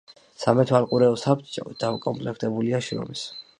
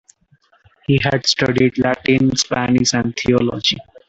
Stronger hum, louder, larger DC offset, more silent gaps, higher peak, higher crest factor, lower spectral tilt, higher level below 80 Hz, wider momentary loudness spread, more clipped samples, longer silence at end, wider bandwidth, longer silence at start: neither; second, -24 LUFS vs -16 LUFS; neither; neither; about the same, -4 dBFS vs -2 dBFS; about the same, 20 dB vs 16 dB; first, -6.5 dB/octave vs -4.5 dB/octave; second, -64 dBFS vs -46 dBFS; first, 11 LU vs 4 LU; neither; about the same, 0.2 s vs 0.25 s; first, 10.5 kHz vs 8 kHz; second, 0.4 s vs 0.9 s